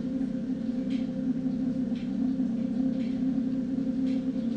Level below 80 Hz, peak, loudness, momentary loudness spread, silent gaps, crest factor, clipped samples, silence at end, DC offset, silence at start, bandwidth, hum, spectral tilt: -56 dBFS; -18 dBFS; -30 LUFS; 3 LU; none; 10 dB; under 0.1%; 0 s; under 0.1%; 0 s; 7.2 kHz; none; -8.5 dB/octave